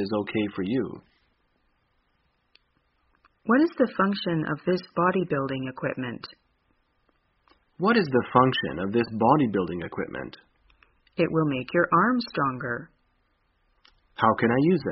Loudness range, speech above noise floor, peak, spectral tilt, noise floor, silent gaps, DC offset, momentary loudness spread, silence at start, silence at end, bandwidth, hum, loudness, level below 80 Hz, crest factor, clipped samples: 5 LU; 46 dB; -4 dBFS; -5 dB/octave; -71 dBFS; none; under 0.1%; 14 LU; 0 s; 0 s; 5.6 kHz; none; -25 LUFS; -60 dBFS; 24 dB; under 0.1%